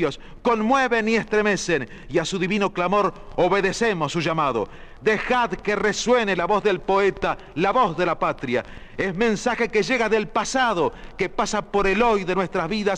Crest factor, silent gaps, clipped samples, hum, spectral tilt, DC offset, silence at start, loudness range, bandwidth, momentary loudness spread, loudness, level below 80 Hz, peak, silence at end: 14 dB; none; under 0.1%; none; -4.5 dB/octave; under 0.1%; 0 s; 1 LU; 10.5 kHz; 7 LU; -22 LUFS; -42 dBFS; -8 dBFS; 0 s